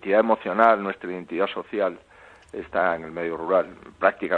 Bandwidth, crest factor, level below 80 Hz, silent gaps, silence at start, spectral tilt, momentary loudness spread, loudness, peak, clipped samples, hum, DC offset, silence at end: 7.2 kHz; 22 dB; -60 dBFS; none; 0 s; -7 dB/octave; 13 LU; -24 LUFS; -2 dBFS; under 0.1%; none; under 0.1%; 0 s